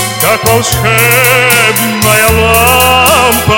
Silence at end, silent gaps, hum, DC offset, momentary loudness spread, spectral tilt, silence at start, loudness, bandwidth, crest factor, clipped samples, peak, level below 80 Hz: 0 s; none; none; 0.5%; 4 LU; -3 dB/octave; 0 s; -6 LUFS; over 20 kHz; 8 dB; 4%; 0 dBFS; -28 dBFS